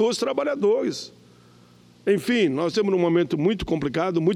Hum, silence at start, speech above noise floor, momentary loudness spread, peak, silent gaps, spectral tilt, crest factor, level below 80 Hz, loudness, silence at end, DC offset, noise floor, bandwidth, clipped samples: 60 Hz at -45 dBFS; 0 s; 30 dB; 7 LU; -8 dBFS; none; -6 dB/octave; 14 dB; -50 dBFS; -23 LUFS; 0 s; under 0.1%; -52 dBFS; 14.5 kHz; under 0.1%